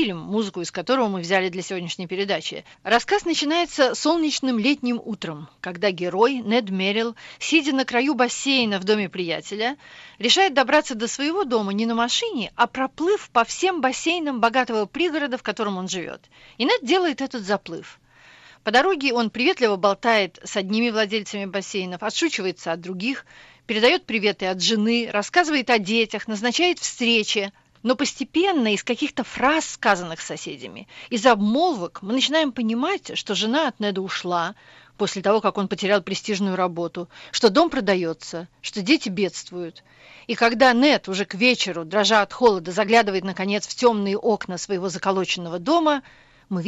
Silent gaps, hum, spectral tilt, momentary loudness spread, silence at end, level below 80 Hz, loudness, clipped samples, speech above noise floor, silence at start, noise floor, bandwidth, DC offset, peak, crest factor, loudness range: none; none; -3.5 dB/octave; 11 LU; 0 s; -60 dBFS; -22 LUFS; under 0.1%; 28 dB; 0 s; -50 dBFS; 8.4 kHz; under 0.1%; -4 dBFS; 18 dB; 4 LU